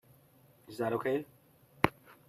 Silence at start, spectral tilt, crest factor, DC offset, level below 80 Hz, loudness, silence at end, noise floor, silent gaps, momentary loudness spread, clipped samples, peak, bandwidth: 0.7 s; -6.5 dB/octave; 30 dB; under 0.1%; -64 dBFS; -34 LUFS; 0.15 s; -63 dBFS; none; 15 LU; under 0.1%; -6 dBFS; 14.5 kHz